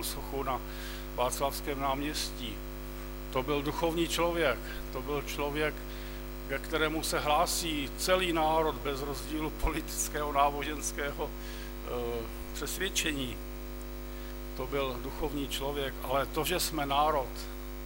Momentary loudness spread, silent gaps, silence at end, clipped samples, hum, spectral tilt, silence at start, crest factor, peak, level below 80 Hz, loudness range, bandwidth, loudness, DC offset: 13 LU; none; 0 s; under 0.1%; 50 Hz at -40 dBFS; -3.5 dB/octave; 0 s; 20 dB; -12 dBFS; -42 dBFS; 5 LU; 16.5 kHz; -33 LUFS; under 0.1%